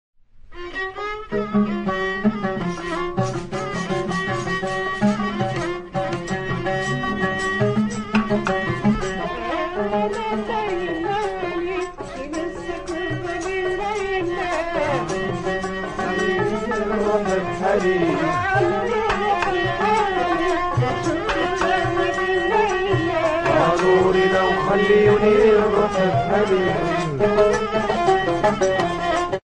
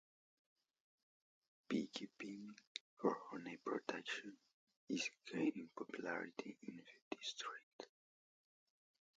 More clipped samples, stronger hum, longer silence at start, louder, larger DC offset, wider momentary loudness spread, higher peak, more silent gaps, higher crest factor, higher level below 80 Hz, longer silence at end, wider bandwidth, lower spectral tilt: neither; neither; second, 0.35 s vs 1.7 s; first, -21 LUFS vs -47 LUFS; neither; second, 9 LU vs 13 LU; first, -4 dBFS vs -24 dBFS; second, none vs 2.67-2.97 s, 4.53-4.67 s, 4.76-4.87 s, 7.02-7.11 s, 7.63-7.79 s; second, 16 dB vs 24 dB; first, -40 dBFS vs under -90 dBFS; second, 0.1 s vs 1.3 s; first, 10 kHz vs 9 kHz; first, -6 dB/octave vs -4 dB/octave